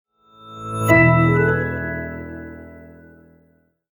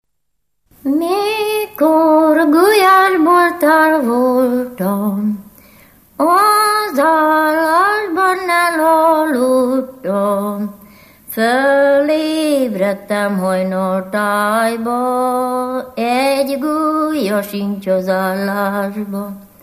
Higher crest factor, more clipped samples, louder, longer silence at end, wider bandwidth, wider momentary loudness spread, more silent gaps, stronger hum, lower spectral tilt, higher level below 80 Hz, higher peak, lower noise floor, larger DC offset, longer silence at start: first, 20 dB vs 14 dB; neither; second, -17 LUFS vs -14 LUFS; first, 1.05 s vs 0.2 s; first, over 20 kHz vs 15 kHz; first, 24 LU vs 9 LU; neither; neither; first, -7.5 dB/octave vs -5 dB/octave; first, -44 dBFS vs -58 dBFS; about the same, -2 dBFS vs 0 dBFS; second, -60 dBFS vs -73 dBFS; neither; second, 0.45 s vs 0.85 s